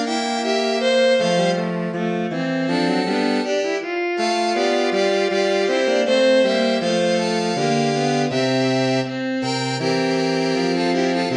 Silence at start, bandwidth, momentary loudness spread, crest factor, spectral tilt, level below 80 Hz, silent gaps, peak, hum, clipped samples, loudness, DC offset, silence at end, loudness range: 0 s; 11 kHz; 6 LU; 14 dB; -5 dB/octave; -70 dBFS; none; -6 dBFS; none; under 0.1%; -19 LUFS; under 0.1%; 0 s; 2 LU